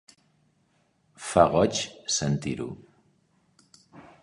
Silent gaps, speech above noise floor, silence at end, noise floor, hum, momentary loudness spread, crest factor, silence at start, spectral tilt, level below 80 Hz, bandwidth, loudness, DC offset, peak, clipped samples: none; 44 dB; 0.2 s; -68 dBFS; none; 18 LU; 24 dB; 1.2 s; -4.5 dB/octave; -54 dBFS; 11.5 kHz; -25 LUFS; under 0.1%; -4 dBFS; under 0.1%